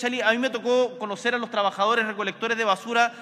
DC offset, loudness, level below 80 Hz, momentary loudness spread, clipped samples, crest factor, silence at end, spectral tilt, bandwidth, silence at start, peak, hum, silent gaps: under 0.1%; -24 LUFS; -80 dBFS; 5 LU; under 0.1%; 18 dB; 0 s; -3 dB/octave; 13 kHz; 0 s; -6 dBFS; none; none